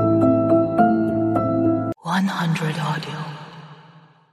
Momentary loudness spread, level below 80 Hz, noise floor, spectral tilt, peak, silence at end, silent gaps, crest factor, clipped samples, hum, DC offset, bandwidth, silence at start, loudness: 14 LU; -54 dBFS; -49 dBFS; -7.5 dB/octave; -4 dBFS; 0.6 s; none; 16 dB; under 0.1%; none; under 0.1%; 12.5 kHz; 0 s; -20 LUFS